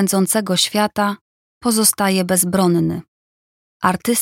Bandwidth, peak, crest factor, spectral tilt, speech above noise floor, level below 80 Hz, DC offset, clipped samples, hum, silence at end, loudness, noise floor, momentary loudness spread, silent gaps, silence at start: 17 kHz; -2 dBFS; 16 dB; -3.5 dB/octave; over 73 dB; -54 dBFS; under 0.1%; under 0.1%; none; 0 s; -17 LUFS; under -90 dBFS; 8 LU; 1.21-1.61 s, 3.08-3.80 s; 0 s